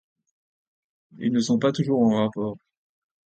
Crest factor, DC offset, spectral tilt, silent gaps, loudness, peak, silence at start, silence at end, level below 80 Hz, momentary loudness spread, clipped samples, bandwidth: 16 dB; under 0.1%; -6.5 dB/octave; none; -23 LUFS; -8 dBFS; 1.2 s; 0.7 s; -64 dBFS; 11 LU; under 0.1%; 8.8 kHz